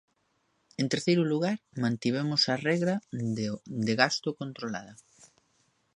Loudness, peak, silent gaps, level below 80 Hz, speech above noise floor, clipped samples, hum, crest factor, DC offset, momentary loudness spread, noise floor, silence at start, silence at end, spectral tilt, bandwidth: -29 LUFS; -6 dBFS; none; -70 dBFS; 45 dB; under 0.1%; none; 24 dB; under 0.1%; 11 LU; -73 dBFS; 0.8 s; 1 s; -5 dB/octave; 11 kHz